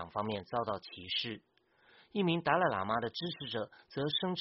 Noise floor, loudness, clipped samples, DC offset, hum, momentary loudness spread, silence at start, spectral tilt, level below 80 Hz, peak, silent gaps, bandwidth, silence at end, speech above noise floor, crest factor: -66 dBFS; -35 LUFS; under 0.1%; under 0.1%; none; 11 LU; 0 s; -3 dB/octave; -70 dBFS; -14 dBFS; none; 5.8 kHz; 0 s; 31 dB; 22 dB